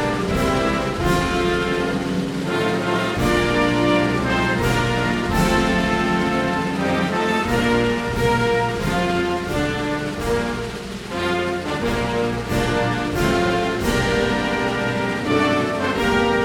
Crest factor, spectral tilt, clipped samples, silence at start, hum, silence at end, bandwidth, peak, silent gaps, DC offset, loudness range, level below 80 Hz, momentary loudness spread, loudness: 16 dB; -5.5 dB/octave; under 0.1%; 0 s; none; 0 s; 18 kHz; -4 dBFS; none; under 0.1%; 4 LU; -34 dBFS; 5 LU; -20 LUFS